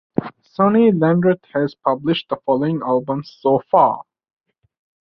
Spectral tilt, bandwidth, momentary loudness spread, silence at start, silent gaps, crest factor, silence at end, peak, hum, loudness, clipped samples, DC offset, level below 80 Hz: -9.5 dB/octave; 6 kHz; 12 LU; 0.2 s; none; 18 dB; 1.05 s; -2 dBFS; none; -18 LUFS; under 0.1%; under 0.1%; -58 dBFS